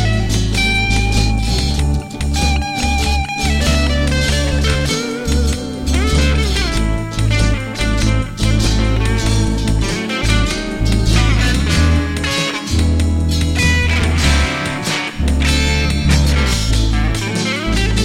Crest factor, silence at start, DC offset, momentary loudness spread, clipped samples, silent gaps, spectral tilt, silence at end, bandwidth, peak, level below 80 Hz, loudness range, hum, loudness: 14 dB; 0 s; under 0.1%; 5 LU; under 0.1%; none; -4.5 dB/octave; 0 s; 15.5 kHz; 0 dBFS; -18 dBFS; 2 LU; none; -16 LUFS